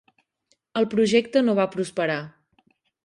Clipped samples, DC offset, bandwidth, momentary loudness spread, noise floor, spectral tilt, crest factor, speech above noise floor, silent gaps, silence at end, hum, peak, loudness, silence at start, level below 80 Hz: under 0.1%; under 0.1%; 11.5 kHz; 11 LU; -70 dBFS; -5.5 dB/octave; 18 dB; 48 dB; none; 0.75 s; none; -6 dBFS; -23 LUFS; 0.75 s; -68 dBFS